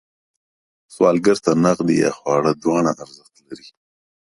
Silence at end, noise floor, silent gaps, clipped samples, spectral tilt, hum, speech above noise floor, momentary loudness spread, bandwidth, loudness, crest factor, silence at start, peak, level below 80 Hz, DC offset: 0.65 s; under -90 dBFS; none; under 0.1%; -6 dB/octave; none; over 72 dB; 19 LU; 11.5 kHz; -18 LUFS; 18 dB; 0.9 s; -2 dBFS; -58 dBFS; under 0.1%